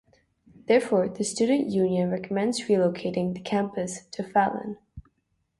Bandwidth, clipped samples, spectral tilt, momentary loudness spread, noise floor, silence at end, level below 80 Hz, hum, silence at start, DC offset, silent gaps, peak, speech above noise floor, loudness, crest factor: 11.5 kHz; under 0.1%; -5.5 dB/octave; 11 LU; -74 dBFS; 0.6 s; -60 dBFS; none; 0.7 s; under 0.1%; none; -8 dBFS; 49 dB; -26 LUFS; 18 dB